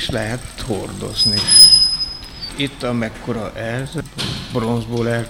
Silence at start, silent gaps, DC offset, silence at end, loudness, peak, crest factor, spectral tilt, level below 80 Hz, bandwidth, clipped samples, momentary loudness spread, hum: 0 s; none; under 0.1%; 0 s; -14 LUFS; 0 dBFS; 18 dB; -2.5 dB/octave; -38 dBFS; 18 kHz; under 0.1%; 19 LU; none